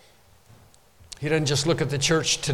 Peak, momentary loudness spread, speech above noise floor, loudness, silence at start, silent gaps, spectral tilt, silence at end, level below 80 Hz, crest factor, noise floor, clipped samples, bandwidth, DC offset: -10 dBFS; 10 LU; 33 dB; -23 LUFS; 1.1 s; none; -3.5 dB/octave; 0 s; -50 dBFS; 16 dB; -56 dBFS; under 0.1%; 16 kHz; under 0.1%